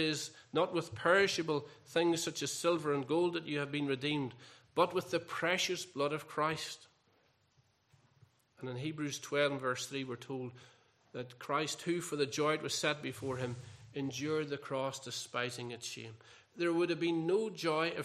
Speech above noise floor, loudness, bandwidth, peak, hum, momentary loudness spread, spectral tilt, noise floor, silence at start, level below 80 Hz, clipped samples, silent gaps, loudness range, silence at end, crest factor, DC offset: 37 dB; -35 LUFS; 14.5 kHz; -14 dBFS; none; 11 LU; -4 dB/octave; -73 dBFS; 0 s; -80 dBFS; under 0.1%; none; 7 LU; 0 s; 22 dB; under 0.1%